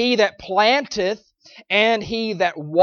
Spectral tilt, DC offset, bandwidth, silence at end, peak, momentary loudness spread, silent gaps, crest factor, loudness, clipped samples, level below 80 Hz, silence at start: -4 dB/octave; under 0.1%; 7.2 kHz; 0 s; -2 dBFS; 8 LU; none; 18 dB; -19 LUFS; under 0.1%; -56 dBFS; 0 s